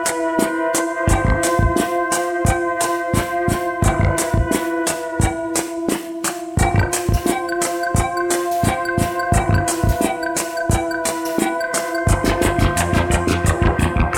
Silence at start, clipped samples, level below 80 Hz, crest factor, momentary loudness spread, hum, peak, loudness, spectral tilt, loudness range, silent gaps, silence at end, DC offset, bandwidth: 0 s; under 0.1%; -26 dBFS; 16 dB; 4 LU; none; -2 dBFS; -19 LUFS; -5 dB/octave; 2 LU; none; 0 s; under 0.1%; 18 kHz